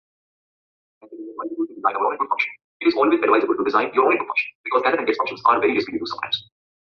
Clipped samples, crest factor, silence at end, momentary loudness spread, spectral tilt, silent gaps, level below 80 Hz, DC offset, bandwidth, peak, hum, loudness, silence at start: under 0.1%; 18 dB; 0.45 s; 10 LU; -5.5 dB/octave; 2.64-2.80 s, 4.55-4.64 s; -66 dBFS; under 0.1%; 6.4 kHz; -4 dBFS; none; -21 LUFS; 1.05 s